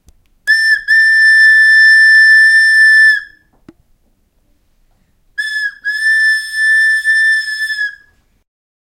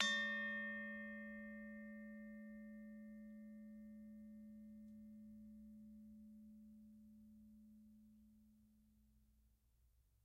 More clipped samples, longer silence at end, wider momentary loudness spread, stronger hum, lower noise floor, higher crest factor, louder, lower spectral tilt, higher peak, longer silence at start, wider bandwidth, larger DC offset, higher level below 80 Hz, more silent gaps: neither; first, 0.95 s vs 0.25 s; second, 13 LU vs 21 LU; neither; second, -56 dBFS vs -76 dBFS; second, 10 dB vs 34 dB; first, -7 LUFS vs -50 LUFS; second, 3.5 dB/octave vs -2.5 dB/octave; first, 0 dBFS vs -18 dBFS; first, 0.45 s vs 0 s; second, 13 kHz vs 15.5 kHz; neither; first, -54 dBFS vs -78 dBFS; neither